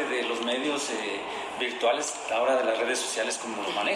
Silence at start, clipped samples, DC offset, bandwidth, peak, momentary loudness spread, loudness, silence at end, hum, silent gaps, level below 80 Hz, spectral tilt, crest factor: 0 s; under 0.1%; under 0.1%; 15 kHz; -14 dBFS; 6 LU; -28 LUFS; 0 s; none; none; -72 dBFS; -1 dB/octave; 14 dB